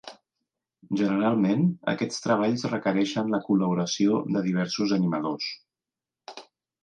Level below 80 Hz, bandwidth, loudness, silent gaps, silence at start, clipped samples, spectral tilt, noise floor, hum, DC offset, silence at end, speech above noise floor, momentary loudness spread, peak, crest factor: -70 dBFS; 9.4 kHz; -26 LUFS; none; 0.05 s; under 0.1%; -6 dB/octave; under -90 dBFS; none; under 0.1%; 0.4 s; over 65 dB; 16 LU; -10 dBFS; 18 dB